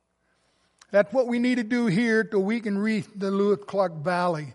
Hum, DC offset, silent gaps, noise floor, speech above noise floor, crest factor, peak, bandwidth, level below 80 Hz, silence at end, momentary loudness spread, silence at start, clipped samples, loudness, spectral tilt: none; under 0.1%; none; -70 dBFS; 46 dB; 18 dB; -6 dBFS; 11.5 kHz; -74 dBFS; 0 s; 4 LU; 0.9 s; under 0.1%; -25 LUFS; -6.5 dB/octave